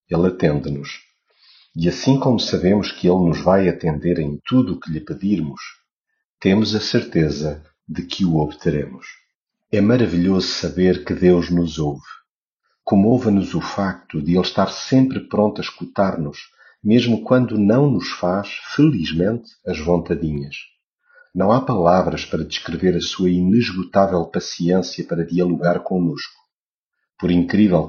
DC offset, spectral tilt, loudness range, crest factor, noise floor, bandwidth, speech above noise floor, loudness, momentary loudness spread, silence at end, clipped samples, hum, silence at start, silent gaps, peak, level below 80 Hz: under 0.1%; -6 dB/octave; 3 LU; 18 dB; -85 dBFS; 7.2 kHz; 67 dB; -19 LUFS; 12 LU; 0 s; under 0.1%; none; 0.1 s; 5.92-6.01 s, 6.24-6.38 s, 9.35-9.46 s, 12.31-12.57 s, 20.86-20.98 s, 26.53-26.90 s; -2 dBFS; -44 dBFS